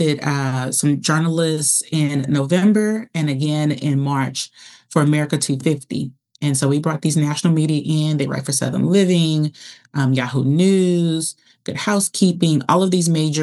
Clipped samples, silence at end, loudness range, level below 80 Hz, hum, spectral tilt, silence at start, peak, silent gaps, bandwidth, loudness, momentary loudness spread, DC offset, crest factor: under 0.1%; 0 s; 3 LU; -70 dBFS; none; -5 dB/octave; 0 s; -2 dBFS; none; 13.5 kHz; -18 LUFS; 8 LU; under 0.1%; 16 dB